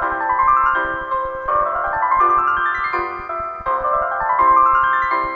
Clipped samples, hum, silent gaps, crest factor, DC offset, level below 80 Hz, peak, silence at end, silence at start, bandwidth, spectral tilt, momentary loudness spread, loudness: under 0.1%; none; none; 14 dB; under 0.1%; -42 dBFS; -4 dBFS; 0 s; 0 s; 6 kHz; -6 dB/octave; 9 LU; -17 LUFS